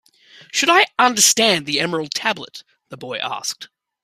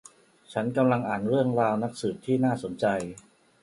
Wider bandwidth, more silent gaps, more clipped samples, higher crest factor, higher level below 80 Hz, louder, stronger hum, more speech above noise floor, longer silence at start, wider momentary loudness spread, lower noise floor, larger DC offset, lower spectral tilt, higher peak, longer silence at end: first, 16 kHz vs 11.5 kHz; neither; neither; about the same, 20 dB vs 18 dB; about the same, -66 dBFS vs -64 dBFS; first, -17 LUFS vs -27 LUFS; neither; about the same, 29 dB vs 26 dB; about the same, 0.55 s vs 0.5 s; first, 17 LU vs 8 LU; second, -48 dBFS vs -52 dBFS; neither; second, -1 dB/octave vs -7 dB/octave; first, 0 dBFS vs -10 dBFS; about the same, 0.4 s vs 0.4 s